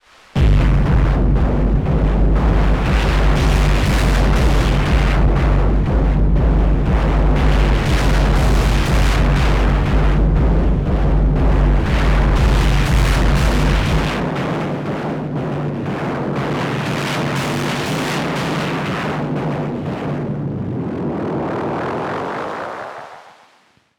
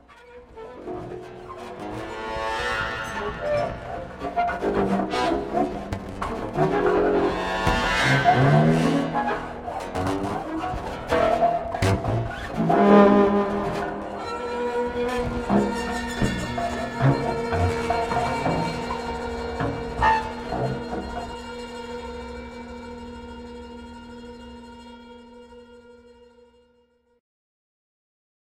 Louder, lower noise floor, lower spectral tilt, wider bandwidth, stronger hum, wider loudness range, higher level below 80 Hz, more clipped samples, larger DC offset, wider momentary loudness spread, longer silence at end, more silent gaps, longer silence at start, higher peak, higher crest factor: first, -18 LUFS vs -24 LUFS; second, -55 dBFS vs -63 dBFS; about the same, -6.5 dB/octave vs -6.5 dB/octave; second, 12.5 kHz vs 16 kHz; neither; second, 6 LU vs 17 LU; first, -18 dBFS vs -42 dBFS; neither; neither; second, 7 LU vs 19 LU; second, 0.8 s vs 2.55 s; neither; first, 0.35 s vs 0.1 s; about the same, -2 dBFS vs -4 dBFS; second, 12 dB vs 20 dB